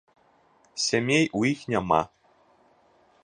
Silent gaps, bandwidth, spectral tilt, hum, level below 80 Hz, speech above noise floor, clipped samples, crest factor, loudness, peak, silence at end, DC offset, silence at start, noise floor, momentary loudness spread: none; 10.5 kHz; -4 dB/octave; none; -58 dBFS; 37 dB; under 0.1%; 22 dB; -25 LUFS; -6 dBFS; 1.2 s; under 0.1%; 0.75 s; -62 dBFS; 11 LU